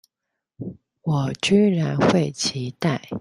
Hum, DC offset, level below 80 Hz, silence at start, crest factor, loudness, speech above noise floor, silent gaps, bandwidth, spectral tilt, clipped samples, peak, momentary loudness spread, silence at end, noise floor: none; under 0.1%; -58 dBFS; 0.6 s; 18 dB; -21 LUFS; 62 dB; none; 11.5 kHz; -5.5 dB/octave; under 0.1%; -4 dBFS; 19 LU; 0 s; -82 dBFS